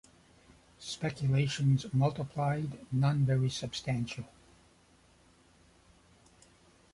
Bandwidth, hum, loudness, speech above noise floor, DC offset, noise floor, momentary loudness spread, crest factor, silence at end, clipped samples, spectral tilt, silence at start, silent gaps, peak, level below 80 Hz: 11.5 kHz; none; -32 LUFS; 33 dB; under 0.1%; -64 dBFS; 12 LU; 16 dB; 2.65 s; under 0.1%; -6.5 dB/octave; 0.8 s; none; -18 dBFS; -62 dBFS